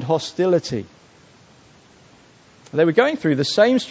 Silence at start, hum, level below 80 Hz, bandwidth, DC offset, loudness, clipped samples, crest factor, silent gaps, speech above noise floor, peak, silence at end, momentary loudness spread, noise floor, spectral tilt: 0 s; none; -60 dBFS; 8 kHz; under 0.1%; -19 LUFS; under 0.1%; 20 dB; none; 32 dB; -2 dBFS; 0 s; 11 LU; -51 dBFS; -5.5 dB/octave